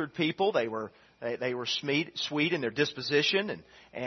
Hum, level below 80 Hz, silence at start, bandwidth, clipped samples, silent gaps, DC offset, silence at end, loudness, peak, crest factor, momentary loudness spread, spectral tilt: none; -74 dBFS; 0 s; 6.4 kHz; under 0.1%; none; under 0.1%; 0 s; -30 LUFS; -12 dBFS; 18 dB; 12 LU; -4.5 dB/octave